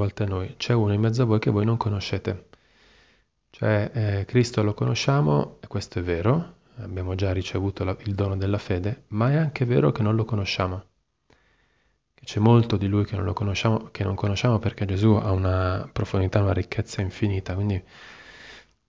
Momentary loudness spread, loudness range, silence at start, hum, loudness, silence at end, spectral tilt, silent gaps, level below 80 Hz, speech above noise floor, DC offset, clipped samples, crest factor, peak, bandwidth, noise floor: 11 LU; 3 LU; 0 s; none; -24 LUFS; 0.3 s; -7 dB/octave; none; -40 dBFS; 45 dB; under 0.1%; under 0.1%; 18 dB; -6 dBFS; 7.8 kHz; -68 dBFS